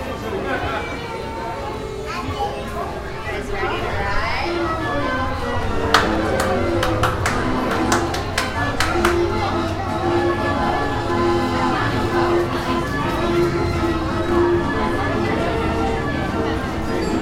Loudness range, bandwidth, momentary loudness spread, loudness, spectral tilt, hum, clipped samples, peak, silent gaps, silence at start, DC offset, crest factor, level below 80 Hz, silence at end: 5 LU; 16 kHz; 8 LU; -21 LUFS; -5.5 dB/octave; none; under 0.1%; 0 dBFS; none; 0 s; under 0.1%; 20 dB; -32 dBFS; 0 s